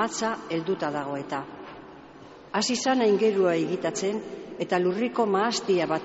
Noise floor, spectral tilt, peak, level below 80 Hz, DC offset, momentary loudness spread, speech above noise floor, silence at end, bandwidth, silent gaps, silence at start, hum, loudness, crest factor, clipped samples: -47 dBFS; -3.5 dB/octave; -12 dBFS; -66 dBFS; under 0.1%; 15 LU; 21 dB; 0 s; 8 kHz; none; 0 s; none; -26 LUFS; 16 dB; under 0.1%